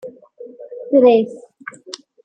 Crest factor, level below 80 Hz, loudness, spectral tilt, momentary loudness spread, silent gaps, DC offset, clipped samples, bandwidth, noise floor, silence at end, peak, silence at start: 18 dB; -68 dBFS; -14 LUFS; -5.5 dB/octave; 25 LU; none; under 0.1%; under 0.1%; 9 kHz; -39 dBFS; 0.85 s; -2 dBFS; 0.05 s